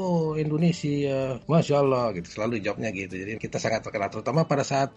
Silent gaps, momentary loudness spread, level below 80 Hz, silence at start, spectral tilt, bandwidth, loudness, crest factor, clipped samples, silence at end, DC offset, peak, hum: none; 8 LU; -56 dBFS; 0 s; -6.5 dB/octave; 8.4 kHz; -26 LUFS; 16 dB; under 0.1%; 0.05 s; under 0.1%; -8 dBFS; none